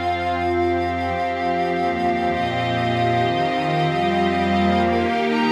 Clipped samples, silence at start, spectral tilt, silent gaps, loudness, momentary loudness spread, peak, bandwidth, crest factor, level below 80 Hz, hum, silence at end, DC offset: under 0.1%; 0 s; -6.5 dB/octave; none; -20 LUFS; 3 LU; -6 dBFS; 12 kHz; 14 dB; -46 dBFS; none; 0 s; under 0.1%